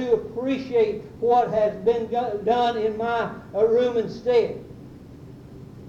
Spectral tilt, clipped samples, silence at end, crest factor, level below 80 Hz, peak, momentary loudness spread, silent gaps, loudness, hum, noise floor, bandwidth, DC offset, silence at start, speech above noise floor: -6.5 dB/octave; under 0.1%; 0 s; 16 dB; -54 dBFS; -8 dBFS; 23 LU; none; -23 LUFS; none; -42 dBFS; 7.2 kHz; under 0.1%; 0 s; 20 dB